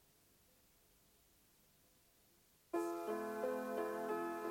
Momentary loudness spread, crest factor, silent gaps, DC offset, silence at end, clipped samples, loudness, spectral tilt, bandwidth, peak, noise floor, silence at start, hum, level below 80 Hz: 2 LU; 18 dB; none; under 0.1%; 0 s; under 0.1%; -43 LUFS; -5 dB/octave; 16.5 kHz; -28 dBFS; -72 dBFS; 2.75 s; none; -82 dBFS